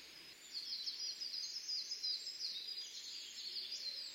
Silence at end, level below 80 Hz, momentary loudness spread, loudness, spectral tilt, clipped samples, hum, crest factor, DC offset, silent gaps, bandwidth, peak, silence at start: 0 s; -88 dBFS; 7 LU; -42 LUFS; 2.5 dB/octave; under 0.1%; none; 16 dB; under 0.1%; none; 16 kHz; -30 dBFS; 0 s